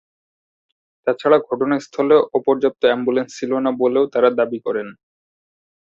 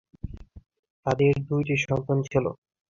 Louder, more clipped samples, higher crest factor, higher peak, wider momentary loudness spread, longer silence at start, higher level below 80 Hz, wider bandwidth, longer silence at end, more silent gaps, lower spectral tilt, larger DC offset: first, -18 LUFS vs -26 LUFS; neither; about the same, 18 dB vs 18 dB; first, -2 dBFS vs -8 dBFS; second, 9 LU vs 18 LU; first, 1.05 s vs 0.25 s; second, -64 dBFS vs -48 dBFS; about the same, 7.6 kHz vs 7.4 kHz; first, 0.9 s vs 0.35 s; second, none vs 0.79-0.83 s, 0.90-1.03 s; second, -5.5 dB/octave vs -7 dB/octave; neither